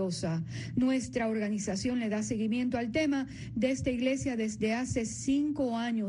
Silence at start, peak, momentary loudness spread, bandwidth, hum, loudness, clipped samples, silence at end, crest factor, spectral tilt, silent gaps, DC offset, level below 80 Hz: 0 s; -16 dBFS; 4 LU; 10.5 kHz; none; -31 LUFS; under 0.1%; 0 s; 14 dB; -5.5 dB/octave; none; under 0.1%; -56 dBFS